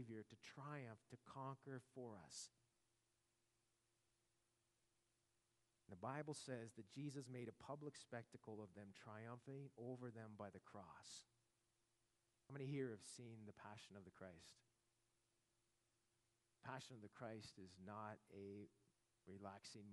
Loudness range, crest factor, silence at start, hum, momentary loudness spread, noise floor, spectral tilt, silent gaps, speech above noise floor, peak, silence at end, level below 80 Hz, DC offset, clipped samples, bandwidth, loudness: 8 LU; 22 dB; 0 s; none; 10 LU; -88 dBFS; -5 dB/octave; none; 31 dB; -36 dBFS; 0 s; under -90 dBFS; under 0.1%; under 0.1%; 11.5 kHz; -57 LUFS